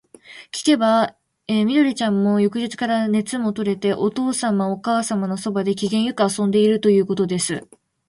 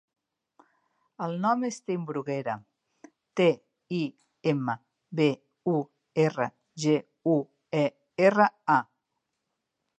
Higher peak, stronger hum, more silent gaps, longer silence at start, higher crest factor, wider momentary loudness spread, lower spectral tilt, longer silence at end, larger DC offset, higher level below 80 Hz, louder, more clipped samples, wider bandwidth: about the same, -4 dBFS vs -6 dBFS; neither; neither; second, 0.3 s vs 1.2 s; second, 16 dB vs 22 dB; second, 7 LU vs 11 LU; second, -5 dB/octave vs -6.5 dB/octave; second, 0.45 s vs 1.15 s; neither; first, -62 dBFS vs -80 dBFS; first, -20 LUFS vs -28 LUFS; neither; first, 11.5 kHz vs 9 kHz